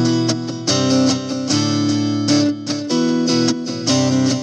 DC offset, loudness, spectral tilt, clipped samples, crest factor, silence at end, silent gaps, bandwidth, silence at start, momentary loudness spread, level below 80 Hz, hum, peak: under 0.1%; -17 LUFS; -4.5 dB/octave; under 0.1%; 14 dB; 0 s; none; 10 kHz; 0 s; 5 LU; -68 dBFS; none; -4 dBFS